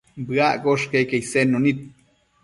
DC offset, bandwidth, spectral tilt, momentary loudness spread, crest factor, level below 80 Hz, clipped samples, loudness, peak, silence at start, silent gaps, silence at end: under 0.1%; 11.5 kHz; -5.5 dB/octave; 5 LU; 16 dB; -58 dBFS; under 0.1%; -20 LUFS; -6 dBFS; 0.15 s; none; 0.55 s